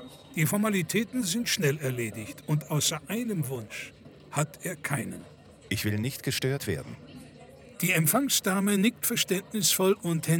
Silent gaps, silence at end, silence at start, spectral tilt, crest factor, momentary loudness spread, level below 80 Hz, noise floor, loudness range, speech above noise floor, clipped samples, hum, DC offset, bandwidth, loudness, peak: none; 0 s; 0 s; -4 dB/octave; 20 dB; 15 LU; -62 dBFS; -50 dBFS; 7 LU; 22 dB; under 0.1%; none; under 0.1%; over 20 kHz; -28 LUFS; -8 dBFS